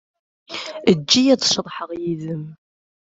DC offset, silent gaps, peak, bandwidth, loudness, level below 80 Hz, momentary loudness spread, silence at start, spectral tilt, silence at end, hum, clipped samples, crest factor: under 0.1%; none; -2 dBFS; 8 kHz; -19 LUFS; -60 dBFS; 16 LU; 0.5 s; -4 dB/octave; 0.65 s; none; under 0.1%; 20 dB